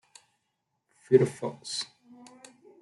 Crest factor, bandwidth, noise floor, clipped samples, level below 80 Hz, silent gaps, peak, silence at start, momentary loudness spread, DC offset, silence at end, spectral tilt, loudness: 24 dB; 11.5 kHz; -80 dBFS; under 0.1%; -78 dBFS; none; -8 dBFS; 1.1 s; 17 LU; under 0.1%; 1 s; -5.5 dB/octave; -27 LUFS